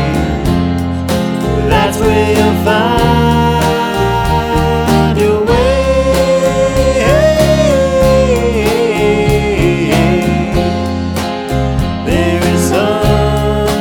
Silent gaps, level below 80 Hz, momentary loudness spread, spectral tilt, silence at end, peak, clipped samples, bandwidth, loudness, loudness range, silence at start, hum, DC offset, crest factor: none; -22 dBFS; 5 LU; -6 dB/octave; 0 s; 0 dBFS; under 0.1%; 19.5 kHz; -12 LUFS; 3 LU; 0 s; none; under 0.1%; 10 dB